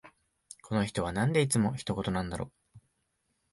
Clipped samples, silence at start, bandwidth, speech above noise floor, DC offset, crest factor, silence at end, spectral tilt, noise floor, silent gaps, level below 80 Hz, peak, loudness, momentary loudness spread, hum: under 0.1%; 0.05 s; 11.5 kHz; 48 dB; under 0.1%; 20 dB; 0.75 s; -5.5 dB/octave; -78 dBFS; none; -54 dBFS; -14 dBFS; -31 LUFS; 16 LU; none